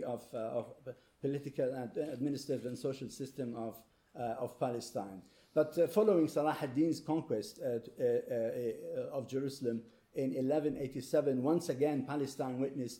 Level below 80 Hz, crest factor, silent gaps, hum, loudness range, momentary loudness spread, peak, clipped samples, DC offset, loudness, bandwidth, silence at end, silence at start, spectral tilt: -74 dBFS; 18 dB; none; none; 6 LU; 11 LU; -18 dBFS; under 0.1%; under 0.1%; -36 LUFS; 17.5 kHz; 0 s; 0 s; -6.5 dB/octave